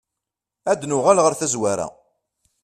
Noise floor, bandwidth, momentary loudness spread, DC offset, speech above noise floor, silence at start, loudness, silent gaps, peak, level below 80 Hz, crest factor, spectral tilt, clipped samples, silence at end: -85 dBFS; 14 kHz; 13 LU; under 0.1%; 66 dB; 0.65 s; -20 LUFS; none; 0 dBFS; -62 dBFS; 22 dB; -4 dB/octave; under 0.1%; 0.75 s